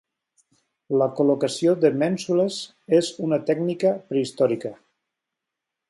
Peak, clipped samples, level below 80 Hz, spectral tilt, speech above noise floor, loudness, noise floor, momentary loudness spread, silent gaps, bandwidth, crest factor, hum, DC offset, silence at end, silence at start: -6 dBFS; under 0.1%; -72 dBFS; -6 dB/octave; 63 dB; -22 LUFS; -84 dBFS; 6 LU; none; 11.5 kHz; 18 dB; none; under 0.1%; 1.15 s; 0.9 s